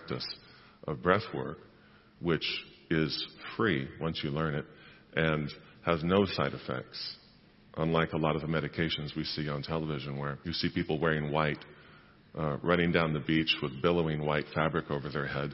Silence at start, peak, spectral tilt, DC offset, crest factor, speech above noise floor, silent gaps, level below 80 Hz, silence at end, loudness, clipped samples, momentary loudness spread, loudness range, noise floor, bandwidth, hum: 0 s; -8 dBFS; -9 dB/octave; under 0.1%; 24 dB; 28 dB; none; -54 dBFS; 0 s; -32 LUFS; under 0.1%; 11 LU; 3 LU; -59 dBFS; 6 kHz; none